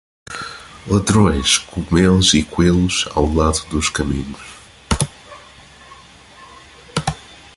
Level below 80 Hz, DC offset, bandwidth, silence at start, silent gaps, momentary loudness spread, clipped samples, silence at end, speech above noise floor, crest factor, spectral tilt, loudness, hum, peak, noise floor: -30 dBFS; under 0.1%; 11.5 kHz; 0.3 s; none; 18 LU; under 0.1%; 0.2 s; 27 dB; 18 dB; -4.5 dB/octave; -17 LUFS; none; 0 dBFS; -43 dBFS